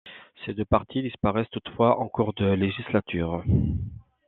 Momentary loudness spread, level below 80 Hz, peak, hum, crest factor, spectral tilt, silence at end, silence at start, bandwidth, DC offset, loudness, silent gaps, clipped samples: 11 LU; -44 dBFS; -4 dBFS; none; 20 dB; -11 dB/octave; 0.3 s; 0.05 s; 4.2 kHz; under 0.1%; -26 LUFS; none; under 0.1%